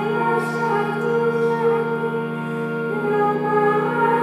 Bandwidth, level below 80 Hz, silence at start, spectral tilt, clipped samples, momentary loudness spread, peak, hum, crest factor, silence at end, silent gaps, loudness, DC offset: 13.5 kHz; -70 dBFS; 0 s; -7.5 dB/octave; under 0.1%; 6 LU; -6 dBFS; none; 14 dB; 0 s; none; -21 LUFS; under 0.1%